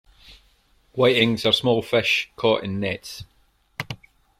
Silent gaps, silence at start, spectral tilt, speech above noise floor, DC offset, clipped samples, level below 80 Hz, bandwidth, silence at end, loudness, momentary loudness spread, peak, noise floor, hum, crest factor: none; 0.3 s; -5 dB/octave; 39 dB; under 0.1%; under 0.1%; -56 dBFS; 15.5 kHz; 0.45 s; -21 LUFS; 19 LU; -4 dBFS; -60 dBFS; none; 20 dB